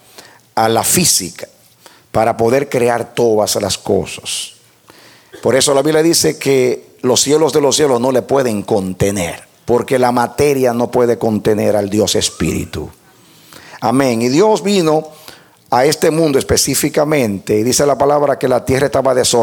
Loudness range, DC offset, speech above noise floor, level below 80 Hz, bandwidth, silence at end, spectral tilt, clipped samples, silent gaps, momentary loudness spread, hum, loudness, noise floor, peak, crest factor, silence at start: 3 LU; under 0.1%; 32 dB; -44 dBFS; 18.5 kHz; 0 s; -4 dB/octave; under 0.1%; none; 9 LU; none; -14 LUFS; -45 dBFS; 0 dBFS; 14 dB; 0.55 s